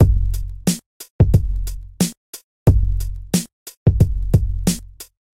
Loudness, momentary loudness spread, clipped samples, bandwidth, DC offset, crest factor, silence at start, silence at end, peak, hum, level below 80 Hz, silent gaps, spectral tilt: -20 LUFS; 19 LU; under 0.1%; 16.5 kHz; under 0.1%; 16 dB; 0 s; 0.3 s; -2 dBFS; none; -22 dBFS; 0.86-1.00 s, 1.10-1.19 s, 2.17-2.33 s, 2.44-2.66 s, 3.53-3.66 s, 3.77-3.86 s; -6 dB/octave